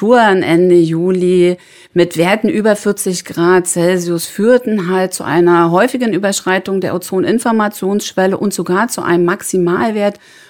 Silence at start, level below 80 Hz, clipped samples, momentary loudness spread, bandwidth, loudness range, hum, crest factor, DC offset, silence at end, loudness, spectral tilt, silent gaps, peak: 0 s; -58 dBFS; under 0.1%; 7 LU; 18 kHz; 2 LU; none; 12 dB; under 0.1%; 0.35 s; -13 LUFS; -5 dB/octave; none; 0 dBFS